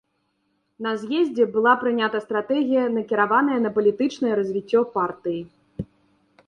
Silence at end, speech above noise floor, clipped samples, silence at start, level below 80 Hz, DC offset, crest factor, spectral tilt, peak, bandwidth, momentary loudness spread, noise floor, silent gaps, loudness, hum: 0.65 s; 50 dB; under 0.1%; 0.8 s; -60 dBFS; under 0.1%; 18 dB; -6.5 dB/octave; -6 dBFS; 9.2 kHz; 13 LU; -71 dBFS; none; -22 LUFS; none